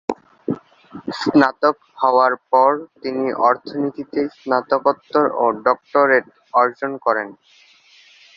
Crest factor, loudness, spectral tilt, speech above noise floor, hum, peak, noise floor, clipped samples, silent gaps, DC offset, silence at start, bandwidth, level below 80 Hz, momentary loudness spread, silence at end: 18 dB; -18 LUFS; -6 dB/octave; 32 dB; none; 0 dBFS; -50 dBFS; under 0.1%; none; under 0.1%; 0.1 s; 7.6 kHz; -64 dBFS; 12 LU; 1.05 s